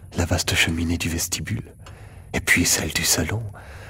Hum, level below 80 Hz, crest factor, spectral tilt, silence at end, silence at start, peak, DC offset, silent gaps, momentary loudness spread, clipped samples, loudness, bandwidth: none; -38 dBFS; 20 dB; -3 dB/octave; 0 s; 0 s; -4 dBFS; under 0.1%; none; 13 LU; under 0.1%; -21 LUFS; 16.5 kHz